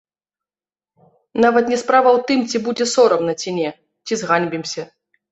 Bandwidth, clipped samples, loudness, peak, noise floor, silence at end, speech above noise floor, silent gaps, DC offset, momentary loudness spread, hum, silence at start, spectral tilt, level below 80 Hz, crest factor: 8.2 kHz; under 0.1%; -17 LUFS; -2 dBFS; under -90 dBFS; 0.5 s; over 73 dB; none; under 0.1%; 13 LU; none; 1.35 s; -4 dB/octave; -62 dBFS; 18 dB